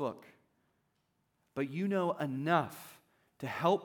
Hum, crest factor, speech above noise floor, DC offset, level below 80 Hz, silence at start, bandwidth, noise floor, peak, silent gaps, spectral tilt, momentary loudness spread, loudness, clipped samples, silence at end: none; 22 dB; 45 dB; under 0.1%; -84 dBFS; 0 s; 19.5 kHz; -79 dBFS; -14 dBFS; none; -6.5 dB/octave; 18 LU; -35 LUFS; under 0.1%; 0 s